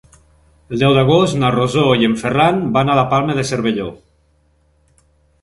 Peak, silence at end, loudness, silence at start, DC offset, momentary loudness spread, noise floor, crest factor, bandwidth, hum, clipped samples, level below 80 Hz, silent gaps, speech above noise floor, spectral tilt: 0 dBFS; 1.45 s; -15 LUFS; 0.7 s; under 0.1%; 7 LU; -57 dBFS; 16 dB; 11.5 kHz; none; under 0.1%; -44 dBFS; none; 43 dB; -6 dB/octave